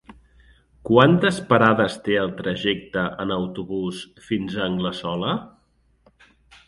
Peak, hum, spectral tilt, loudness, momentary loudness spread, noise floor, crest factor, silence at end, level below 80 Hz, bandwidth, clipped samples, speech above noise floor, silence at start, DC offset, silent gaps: 0 dBFS; none; -6.5 dB/octave; -22 LUFS; 12 LU; -62 dBFS; 22 dB; 1.2 s; -52 dBFS; 11.5 kHz; under 0.1%; 41 dB; 0.1 s; under 0.1%; none